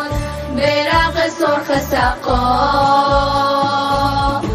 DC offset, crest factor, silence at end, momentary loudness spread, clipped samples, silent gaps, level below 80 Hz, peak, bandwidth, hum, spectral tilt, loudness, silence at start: under 0.1%; 12 dB; 0 s; 4 LU; under 0.1%; none; -28 dBFS; -2 dBFS; 15.5 kHz; none; -5 dB/octave; -15 LUFS; 0 s